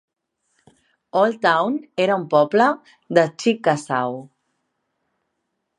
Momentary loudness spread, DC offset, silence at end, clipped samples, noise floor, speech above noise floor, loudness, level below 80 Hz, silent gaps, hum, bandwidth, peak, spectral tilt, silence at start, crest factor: 8 LU; under 0.1%; 1.55 s; under 0.1%; -76 dBFS; 57 dB; -20 LUFS; -74 dBFS; none; none; 11 kHz; -2 dBFS; -5.5 dB/octave; 1.15 s; 20 dB